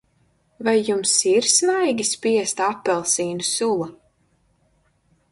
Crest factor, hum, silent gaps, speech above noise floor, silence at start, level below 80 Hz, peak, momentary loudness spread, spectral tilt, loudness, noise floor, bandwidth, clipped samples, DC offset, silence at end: 18 dB; none; none; 43 dB; 0.6 s; -64 dBFS; -4 dBFS; 7 LU; -2 dB/octave; -20 LUFS; -64 dBFS; 11.5 kHz; under 0.1%; under 0.1%; 1.35 s